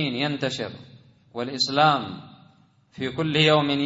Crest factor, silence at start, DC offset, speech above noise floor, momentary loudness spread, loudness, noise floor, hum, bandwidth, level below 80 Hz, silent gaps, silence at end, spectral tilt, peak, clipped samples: 20 dB; 0 s; under 0.1%; 34 dB; 17 LU; -23 LUFS; -57 dBFS; none; 8 kHz; -64 dBFS; none; 0 s; -5 dB/octave; -6 dBFS; under 0.1%